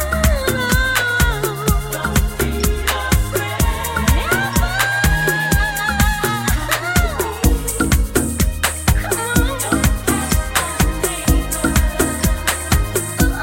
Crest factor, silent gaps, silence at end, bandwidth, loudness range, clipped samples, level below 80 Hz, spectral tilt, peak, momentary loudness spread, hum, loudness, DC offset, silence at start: 16 dB; none; 0 s; 17 kHz; 1 LU; under 0.1%; -20 dBFS; -4 dB/octave; 0 dBFS; 3 LU; none; -17 LUFS; under 0.1%; 0 s